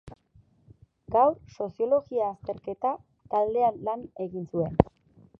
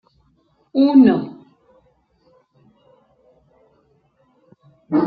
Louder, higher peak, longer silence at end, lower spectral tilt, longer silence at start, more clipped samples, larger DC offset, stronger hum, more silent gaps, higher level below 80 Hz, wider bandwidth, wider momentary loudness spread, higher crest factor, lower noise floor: second, -28 LUFS vs -15 LUFS; about the same, 0 dBFS vs -2 dBFS; first, 0.55 s vs 0 s; about the same, -10 dB/octave vs -10 dB/octave; second, 0.05 s vs 0.75 s; neither; neither; neither; neither; first, -50 dBFS vs -64 dBFS; first, 6.4 kHz vs 4.8 kHz; about the same, 12 LU vs 14 LU; first, 28 dB vs 18 dB; about the same, -61 dBFS vs -61 dBFS